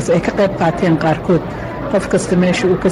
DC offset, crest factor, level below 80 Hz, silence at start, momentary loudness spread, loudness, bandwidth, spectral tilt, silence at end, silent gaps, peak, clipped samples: under 0.1%; 8 dB; -36 dBFS; 0 s; 5 LU; -15 LUFS; 11.5 kHz; -6.5 dB/octave; 0 s; none; -6 dBFS; under 0.1%